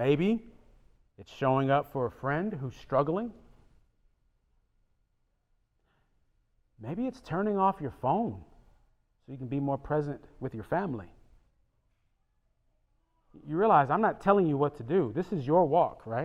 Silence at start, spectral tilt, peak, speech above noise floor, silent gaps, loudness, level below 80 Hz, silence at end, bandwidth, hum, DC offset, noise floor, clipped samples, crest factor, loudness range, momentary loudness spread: 0 s; -9 dB/octave; -10 dBFS; 45 dB; none; -29 LUFS; -60 dBFS; 0 s; 13.5 kHz; none; under 0.1%; -74 dBFS; under 0.1%; 22 dB; 12 LU; 15 LU